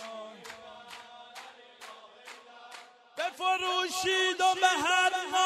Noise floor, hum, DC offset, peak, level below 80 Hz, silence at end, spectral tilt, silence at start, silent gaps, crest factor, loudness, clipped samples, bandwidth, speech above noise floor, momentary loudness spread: -51 dBFS; none; under 0.1%; -12 dBFS; -74 dBFS; 0 s; 0 dB/octave; 0 s; none; 20 dB; -27 LUFS; under 0.1%; 14.5 kHz; 24 dB; 23 LU